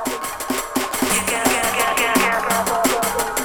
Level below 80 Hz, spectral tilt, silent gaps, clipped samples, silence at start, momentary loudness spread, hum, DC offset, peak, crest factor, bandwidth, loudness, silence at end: -44 dBFS; -2 dB/octave; none; under 0.1%; 0 s; 7 LU; none; under 0.1%; -2 dBFS; 18 dB; over 20 kHz; -19 LUFS; 0 s